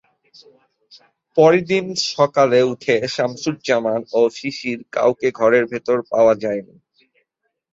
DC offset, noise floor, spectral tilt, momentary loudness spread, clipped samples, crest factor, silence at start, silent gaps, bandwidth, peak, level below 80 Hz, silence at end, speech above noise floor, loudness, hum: under 0.1%; -73 dBFS; -5 dB/octave; 10 LU; under 0.1%; 18 dB; 1.35 s; none; 7.8 kHz; -2 dBFS; -62 dBFS; 1.1 s; 55 dB; -18 LUFS; none